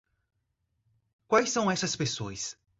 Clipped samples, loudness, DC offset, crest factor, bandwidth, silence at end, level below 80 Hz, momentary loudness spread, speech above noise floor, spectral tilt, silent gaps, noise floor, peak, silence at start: under 0.1%; -28 LUFS; under 0.1%; 22 dB; 8.2 kHz; 0.3 s; -64 dBFS; 10 LU; 51 dB; -3.5 dB/octave; none; -79 dBFS; -10 dBFS; 1.3 s